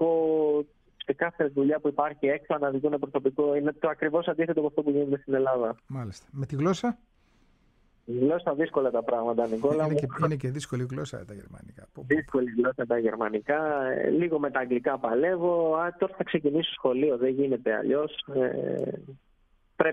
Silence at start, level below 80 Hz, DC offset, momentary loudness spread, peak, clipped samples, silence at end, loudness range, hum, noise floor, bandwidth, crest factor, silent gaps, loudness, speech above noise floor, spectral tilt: 0 s; -62 dBFS; under 0.1%; 9 LU; -8 dBFS; under 0.1%; 0 s; 3 LU; none; -65 dBFS; 9.8 kHz; 20 dB; none; -27 LUFS; 37 dB; -7 dB/octave